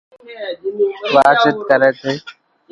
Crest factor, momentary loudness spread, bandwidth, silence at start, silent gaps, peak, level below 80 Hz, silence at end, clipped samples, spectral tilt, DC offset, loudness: 16 dB; 15 LU; 11 kHz; 0.25 s; none; 0 dBFS; -60 dBFS; 0.4 s; under 0.1%; -5 dB/octave; under 0.1%; -15 LUFS